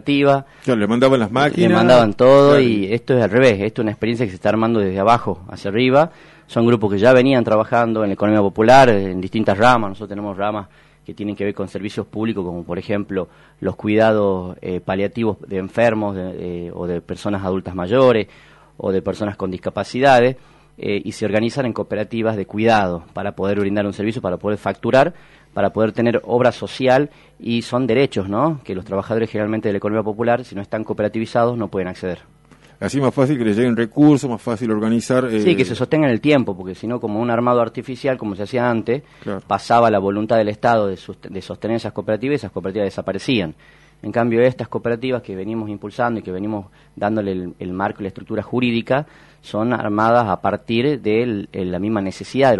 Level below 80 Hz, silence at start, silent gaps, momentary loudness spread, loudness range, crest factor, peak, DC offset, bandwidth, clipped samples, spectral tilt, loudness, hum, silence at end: -52 dBFS; 0.05 s; none; 13 LU; 8 LU; 18 dB; 0 dBFS; under 0.1%; 11.5 kHz; under 0.1%; -7 dB/octave; -18 LUFS; none; 0 s